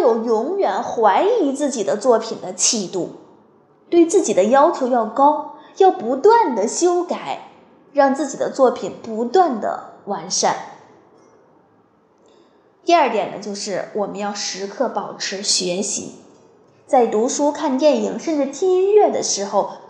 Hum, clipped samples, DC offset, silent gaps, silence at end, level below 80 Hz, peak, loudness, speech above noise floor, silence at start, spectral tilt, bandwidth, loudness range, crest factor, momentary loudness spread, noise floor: none; under 0.1%; under 0.1%; none; 0.05 s; -74 dBFS; -2 dBFS; -18 LUFS; 38 dB; 0 s; -3 dB/octave; 11 kHz; 7 LU; 16 dB; 12 LU; -56 dBFS